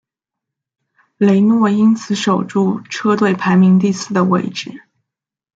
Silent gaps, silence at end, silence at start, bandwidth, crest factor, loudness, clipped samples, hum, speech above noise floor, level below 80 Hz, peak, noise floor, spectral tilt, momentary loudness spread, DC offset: none; 0.85 s; 1.2 s; 7.8 kHz; 14 dB; -14 LUFS; under 0.1%; none; 69 dB; -62 dBFS; -2 dBFS; -82 dBFS; -6.5 dB/octave; 7 LU; under 0.1%